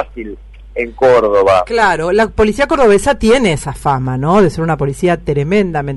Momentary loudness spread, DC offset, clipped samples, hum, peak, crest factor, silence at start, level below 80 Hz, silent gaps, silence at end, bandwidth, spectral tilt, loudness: 10 LU; under 0.1%; under 0.1%; none; -2 dBFS; 10 dB; 0 s; -32 dBFS; none; 0 s; 12 kHz; -6 dB/octave; -12 LUFS